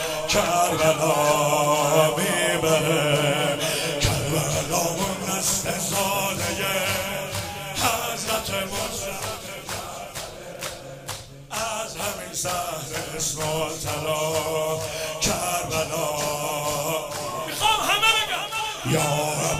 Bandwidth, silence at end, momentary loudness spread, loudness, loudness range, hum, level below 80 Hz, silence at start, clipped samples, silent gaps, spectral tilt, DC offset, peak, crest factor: 16 kHz; 0 s; 12 LU; -23 LUFS; 9 LU; none; -46 dBFS; 0 s; under 0.1%; none; -3 dB/octave; under 0.1%; -6 dBFS; 20 dB